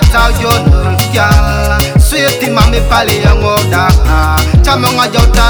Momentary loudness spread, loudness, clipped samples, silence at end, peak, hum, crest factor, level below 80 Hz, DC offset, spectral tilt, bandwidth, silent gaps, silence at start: 2 LU; -9 LUFS; 2%; 0 s; 0 dBFS; none; 8 dB; -12 dBFS; under 0.1%; -5 dB/octave; over 20 kHz; none; 0 s